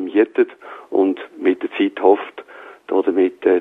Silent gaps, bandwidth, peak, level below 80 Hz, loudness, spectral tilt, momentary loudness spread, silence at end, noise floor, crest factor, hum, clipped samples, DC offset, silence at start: none; 3.9 kHz; -2 dBFS; -70 dBFS; -19 LUFS; -7 dB/octave; 20 LU; 0 s; -39 dBFS; 16 dB; none; under 0.1%; under 0.1%; 0 s